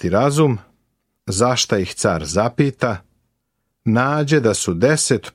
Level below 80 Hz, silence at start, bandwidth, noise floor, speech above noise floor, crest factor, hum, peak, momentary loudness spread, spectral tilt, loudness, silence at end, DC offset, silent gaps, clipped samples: -48 dBFS; 0 s; 15 kHz; -73 dBFS; 56 dB; 16 dB; none; -2 dBFS; 9 LU; -4.5 dB/octave; -18 LUFS; 0.05 s; under 0.1%; none; under 0.1%